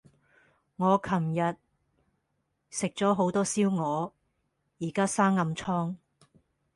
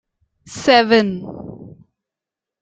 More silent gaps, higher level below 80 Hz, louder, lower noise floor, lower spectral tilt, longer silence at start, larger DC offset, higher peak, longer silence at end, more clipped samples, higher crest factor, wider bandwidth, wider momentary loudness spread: neither; second, -66 dBFS vs -58 dBFS; second, -28 LUFS vs -15 LUFS; second, -78 dBFS vs -87 dBFS; about the same, -5.5 dB/octave vs -4.5 dB/octave; first, 0.8 s vs 0.5 s; neither; second, -10 dBFS vs 0 dBFS; about the same, 0.8 s vs 0.9 s; neither; about the same, 20 dB vs 20 dB; first, 11.5 kHz vs 9.2 kHz; second, 12 LU vs 23 LU